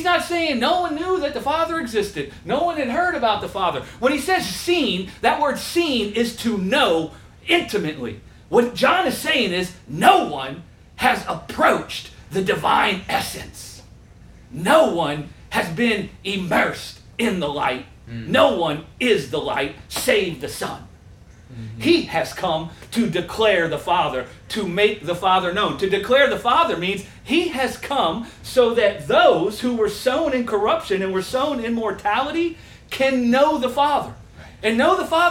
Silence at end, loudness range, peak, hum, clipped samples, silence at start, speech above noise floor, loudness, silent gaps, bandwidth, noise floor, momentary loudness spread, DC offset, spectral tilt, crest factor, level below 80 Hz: 0 s; 3 LU; 0 dBFS; none; under 0.1%; 0 s; 25 dB; -20 LUFS; none; 17 kHz; -45 dBFS; 12 LU; under 0.1%; -4 dB/octave; 20 dB; -48 dBFS